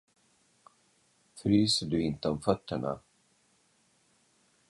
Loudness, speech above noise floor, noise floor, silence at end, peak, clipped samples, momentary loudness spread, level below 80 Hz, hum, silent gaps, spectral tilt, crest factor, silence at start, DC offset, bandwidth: -30 LUFS; 40 dB; -69 dBFS; 1.7 s; -10 dBFS; under 0.1%; 11 LU; -58 dBFS; none; none; -5.5 dB/octave; 24 dB; 1.35 s; under 0.1%; 11.5 kHz